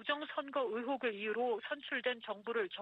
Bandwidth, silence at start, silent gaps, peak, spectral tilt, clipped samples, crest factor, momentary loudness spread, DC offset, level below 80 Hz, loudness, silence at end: 5.2 kHz; 0 s; none; -22 dBFS; -5.5 dB/octave; under 0.1%; 16 dB; 3 LU; under 0.1%; -86 dBFS; -38 LUFS; 0 s